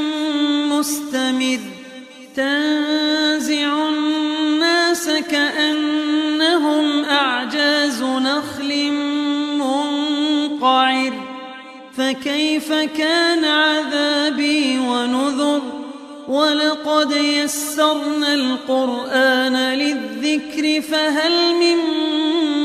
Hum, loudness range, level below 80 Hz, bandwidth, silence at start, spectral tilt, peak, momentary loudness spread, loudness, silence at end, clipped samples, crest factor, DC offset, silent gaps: none; 2 LU; -66 dBFS; 15 kHz; 0 s; -1.5 dB/octave; -2 dBFS; 7 LU; -18 LUFS; 0 s; under 0.1%; 16 dB; under 0.1%; none